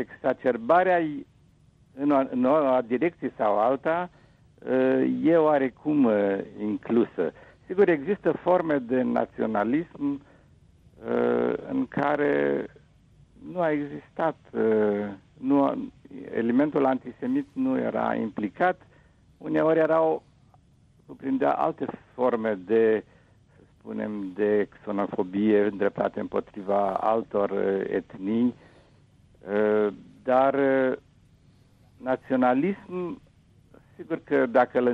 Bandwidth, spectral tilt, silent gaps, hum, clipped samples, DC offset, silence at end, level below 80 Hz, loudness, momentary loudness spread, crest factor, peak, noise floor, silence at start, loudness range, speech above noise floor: 5.4 kHz; -9 dB/octave; none; none; under 0.1%; under 0.1%; 0 s; -64 dBFS; -25 LUFS; 12 LU; 16 dB; -8 dBFS; -59 dBFS; 0 s; 3 LU; 34 dB